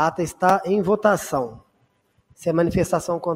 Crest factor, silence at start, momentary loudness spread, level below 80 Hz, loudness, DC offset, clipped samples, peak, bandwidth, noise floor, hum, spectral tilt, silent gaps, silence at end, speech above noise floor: 18 dB; 0 s; 8 LU; -48 dBFS; -21 LUFS; under 0.1%; under 0.1%; -4 dBFS; 16 kHz; -65 dBFS; none; -6 dB/octave; none; 0 s; 44 dB